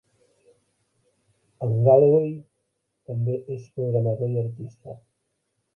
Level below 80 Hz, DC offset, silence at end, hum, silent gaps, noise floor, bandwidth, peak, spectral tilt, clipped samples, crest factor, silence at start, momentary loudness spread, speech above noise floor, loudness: -64 dBFS; under 0.1%; 0.8 s; none; none; -76 dBFS; 2.9 kHz; -4 dBFS; -12 dB/octave; under 0.1%; 22 dB; 1.6 s; 23 LU; 54 dB; -23 LUFS